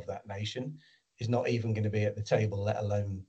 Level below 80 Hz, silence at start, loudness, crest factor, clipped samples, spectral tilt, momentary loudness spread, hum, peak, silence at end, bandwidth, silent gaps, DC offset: -66 dBFS; 0 s; -32 LUFS; 18 dB; under 0.1%; -7 dB/octave; 10 LU; none; -14 dBFS; 0.05 s; 8 kHz; none; under 0.1%